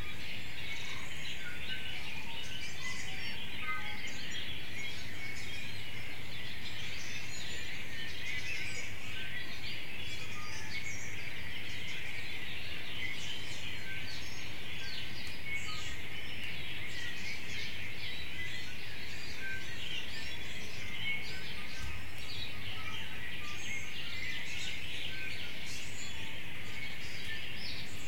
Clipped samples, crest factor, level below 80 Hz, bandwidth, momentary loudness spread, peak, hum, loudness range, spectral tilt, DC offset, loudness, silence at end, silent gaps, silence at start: under 0.1%; 16 dB; -58 dBFS; 16.5 kHz; 4 LU; -22 dBFS; none; 1 LU; -2.5 dB/octave; 3%; -40 LUFS; 0 s; none; 0 s